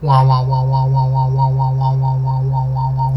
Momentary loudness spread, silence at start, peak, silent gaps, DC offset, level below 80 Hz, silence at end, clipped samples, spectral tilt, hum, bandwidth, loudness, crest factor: 5 LU; 0 s; -2 dBFS; none; under 0.1%; -36 dBFS; 0 s; under 0.1%; -10 dB/octave; none; 5.8 kHz; -15 LUFS; 12 dB